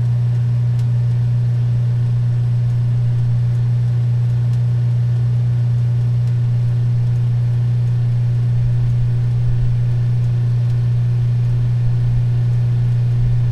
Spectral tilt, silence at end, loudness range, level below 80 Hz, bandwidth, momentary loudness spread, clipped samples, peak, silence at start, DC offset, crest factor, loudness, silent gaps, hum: -9.5 dB/octave; 0 s; 0 LU; -32 dBFS; 4.4 kHz; 1 LU; under 0.1%; -6 dBFS; 0 s; under 0.1%; 10 dB; -17 LUFS; none; 60 Hz at -15 dBFS